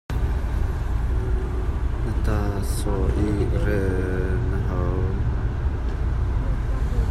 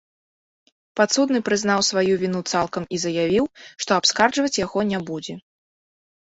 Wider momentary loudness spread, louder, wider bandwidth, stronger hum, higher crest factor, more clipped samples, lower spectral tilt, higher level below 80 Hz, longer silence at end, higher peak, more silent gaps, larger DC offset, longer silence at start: second, 4 LU vs 12 LU; second, -25 LUFS vs -21 LUFS; first, 12.5 kHz vs 8.2 kHz; neither; second, 12 dB vs 20 dB; neither; first, -7.5 dB/octave vs -3.5 dB/octave; first, -24 dBFS vs -58 dBFS; second, 0 s vs 0.9 s; second, -10 dBFS vs -4 dBFS; neither; neither; second, 0.1 s vs 0.95 s